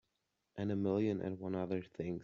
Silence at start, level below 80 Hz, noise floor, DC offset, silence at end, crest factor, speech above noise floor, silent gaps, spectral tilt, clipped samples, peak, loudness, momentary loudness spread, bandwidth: 0.55 s; -72 dBFS; -85 dBFS; under 0.1%; 0 s; 16 dB; 47 dB; none; -8 dB/octave; under 0.1%; -24 dBFS; -38 LUFS; 8 LU; 7.2 kHz